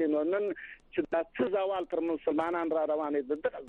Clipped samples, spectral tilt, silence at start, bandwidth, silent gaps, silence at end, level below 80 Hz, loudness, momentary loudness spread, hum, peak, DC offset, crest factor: under 0.1%; -7.5 dB/octave; 0 s; 4.3 kHz; none; 0 s; -66 dBFS; -31 LUFS; 6 LU; none; -16 dBFS; under 0.1%; 14 dB